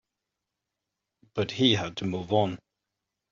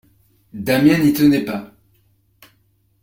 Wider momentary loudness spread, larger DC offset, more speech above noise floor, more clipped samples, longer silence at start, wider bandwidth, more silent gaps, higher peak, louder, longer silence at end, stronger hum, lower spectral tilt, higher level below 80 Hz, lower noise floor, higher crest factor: second, 12 LU vs 16 LU; neither; first, 59 dB vs 45 dB; neither; first, 1.35 s vs 0.55 s; second, 7.6 kHz vs 16.5 kHz; neither; second, -8 dBFS vs -2 dBFS; second, -27 LUFS vs -16 LUFS; second, 0.75 s vs 1.35 s; neither; second, -4 dB/octave vs -6 dB/octave; second, -64 dBFS vs -52 dBFS; first, -86 dBFS vs -61 dBFS; about the same, 22 dB vs 18 dB